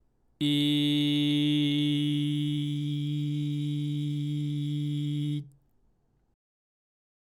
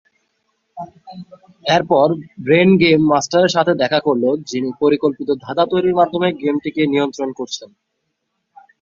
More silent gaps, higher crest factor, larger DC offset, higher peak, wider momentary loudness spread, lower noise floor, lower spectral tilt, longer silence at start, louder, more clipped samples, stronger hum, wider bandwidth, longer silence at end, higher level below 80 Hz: neither; about the same, 12 dB vs 16 dB; neither; second, -18 dBFS vs -2 dBFS; second, 6 LU vs 15 LU; second, -68 dBFS vs -72 dBFS; about the same, -6.5 dB/octave vs -5.5 dB/octave; second, 0.4 s vs 0.75 s; second, -29 LUFS vs -16 LUFS; neither; neither; first, 15 kHz vs 7.6 kHz; first, 1.85 s vs 1.15 s; second, -70 dBFS vs -58 dBFS